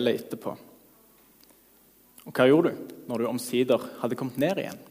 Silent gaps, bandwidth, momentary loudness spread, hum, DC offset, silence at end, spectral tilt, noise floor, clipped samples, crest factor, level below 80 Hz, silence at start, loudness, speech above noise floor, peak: none; 15.5 kHz; 17 LU; none; under 0.1%; 0.05 s; -5.5 dB/octave; -59 dBFS; under 0.1%; 20 dB; -72 dBFS; 0 s; -27 LUFS; 33 dB; -8 dBFS